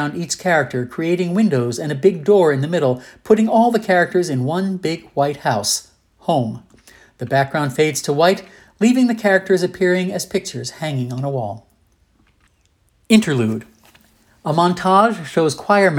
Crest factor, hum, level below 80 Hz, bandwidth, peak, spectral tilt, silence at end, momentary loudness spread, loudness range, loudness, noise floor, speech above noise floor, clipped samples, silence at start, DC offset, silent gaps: 16 dB; none; -58 dBFS; 17.5 kHz; 0 dBFS; -5 dB/octave; 0 s; 10 LU; 6 LU; -18 LUFS; -60 dBFS; 43 dB; under 0.1%; 0 s; under 0.1%; none